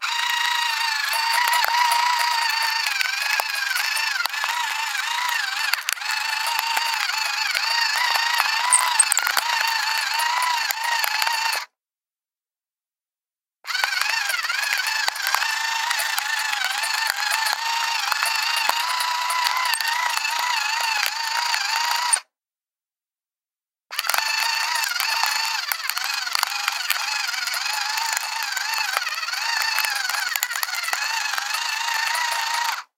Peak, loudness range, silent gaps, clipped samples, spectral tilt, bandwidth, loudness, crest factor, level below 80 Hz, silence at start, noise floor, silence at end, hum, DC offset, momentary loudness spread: 0 dBFS; 5 LU; none; under 0.1%; 7 dB/octave; 17 kHz; -21 LUFS; 22 dB; under -90 dBFS; 0 s; under -90 dBFS; 0.15 s; none; under 0.1%; 4 LU